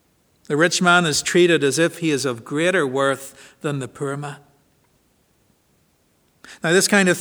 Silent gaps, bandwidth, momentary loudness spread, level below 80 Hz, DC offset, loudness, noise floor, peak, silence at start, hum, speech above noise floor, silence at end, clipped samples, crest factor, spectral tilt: none; over 20 kHz; 13 LU; -64 dBFS; under 0.1%; -19 LUFS; -62 dBFS; -2 dBFS; 0.5 s; none; 43 dB; 0 s; under 0.1%; 20 dB; -4 dB/octave